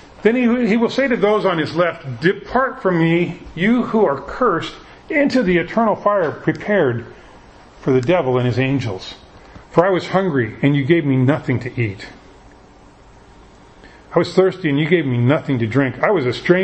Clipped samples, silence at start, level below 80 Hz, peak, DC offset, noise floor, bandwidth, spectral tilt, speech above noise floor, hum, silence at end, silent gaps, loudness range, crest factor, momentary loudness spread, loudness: under 0.1%; 0.2 s; -48 dBFS; 0 dBFS; under 0.1%; -45 dBFS; 8.6 kHz; -7.5 dB/octave; 28 dB; none; 0 s; none; 4 LU; 18 dB; 7 LU; -17 LUFS